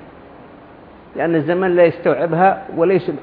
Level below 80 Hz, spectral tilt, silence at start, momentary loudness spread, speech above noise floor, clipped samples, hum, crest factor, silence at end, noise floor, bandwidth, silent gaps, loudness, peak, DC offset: -54 dBFS; -11 dB/octave; 0 s; 5 LU; 26 dB; under 0.1%; none; 16 dB; 0 s; -41 dBFS; 4.9 kHz; none; -16 LUFS; -2 dBFS; under 0.1%